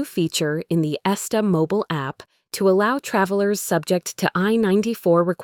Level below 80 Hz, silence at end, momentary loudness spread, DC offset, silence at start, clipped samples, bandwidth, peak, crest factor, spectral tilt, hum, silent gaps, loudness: -62 dBFS; 0 s; 5 LU; under 0.1%; 0 s; under 0.1%; 19 kHz; -4 dBFS; 16 dB; -5 dB/octave; none; none; -21 LUFS